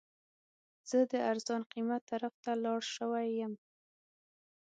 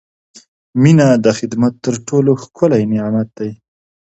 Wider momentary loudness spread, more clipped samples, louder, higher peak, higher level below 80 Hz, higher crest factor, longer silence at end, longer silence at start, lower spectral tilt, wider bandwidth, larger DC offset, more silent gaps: second, 8 LU vs 13 LU; neither; second, -36 LUFS vs -14 LUFS; second, -20 dBFS vs 0 dBFS; second, -90 dBFS vs -54 dBFS; about the same, 18 dB vs 14 dB; first, 1.1 s vs 0.5 s; about the same, 0.85 s vs 0.75 s; second, -4 dB/octave vs -7 dB/octave; about the same, 9 kHz vs 8.2 kHz; neither; first, 1.66-1.70 s, 2.01-2.07 s, 2.34-2.43 s vs none